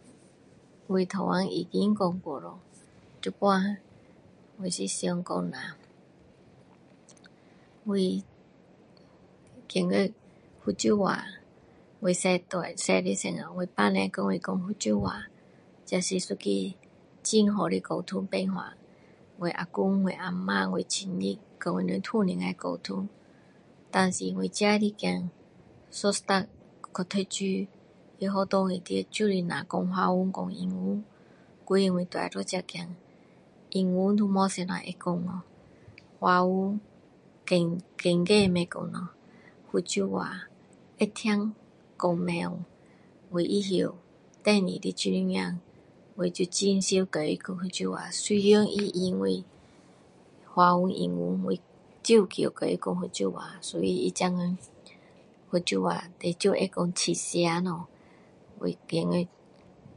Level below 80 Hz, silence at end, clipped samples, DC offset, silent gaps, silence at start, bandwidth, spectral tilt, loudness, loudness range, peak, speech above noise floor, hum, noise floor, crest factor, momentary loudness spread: -64 dBFS; 0.7 s; under 0.1%; under 0.1%; none; 0.9 s; 11 kHz; -5 dB/octave; -29 LUFS; 5 LU; -8 dBFS; 29 dB; none; -57 dBFS; 22 dB; 12 LU